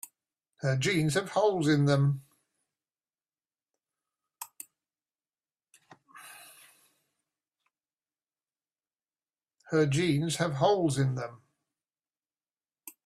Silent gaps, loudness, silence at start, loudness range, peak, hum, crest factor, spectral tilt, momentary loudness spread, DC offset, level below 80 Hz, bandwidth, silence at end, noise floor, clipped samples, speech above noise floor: none; -28 LUFS; 0.6 s; 23 LU; -12 dBFS; none; 20 dB; -6 dB/octave; 23 LU; under 0.1%; -68 dBFS; 15 kHz; 0.15 s; under -90 dBFS; under 0.1%; over 63 dB